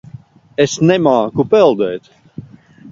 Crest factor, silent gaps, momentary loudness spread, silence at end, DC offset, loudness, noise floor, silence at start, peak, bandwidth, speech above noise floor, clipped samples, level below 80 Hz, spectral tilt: 14 dB; none; 18 LU; 0.05 s; under 0.1%; -13 LUFS; -40 dBFS; 0.6 s; 0 dBFS; 7.6 kHz; 27 dB; under 0.1%; -52 dBFS; -6 dB/octave